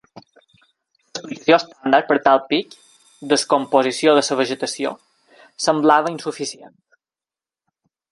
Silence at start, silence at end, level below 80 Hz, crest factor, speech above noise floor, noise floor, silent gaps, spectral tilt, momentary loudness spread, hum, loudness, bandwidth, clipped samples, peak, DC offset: 0.15 s; 1.45 s; -66 dBFS; 20 dB; over 72 dB; under -90 dBFS; none; -3.5 dB/octave; 16 LU; none; -18 LUFS; 11.5 kHz; under 0.1%; -2 dBFS; under 0.1%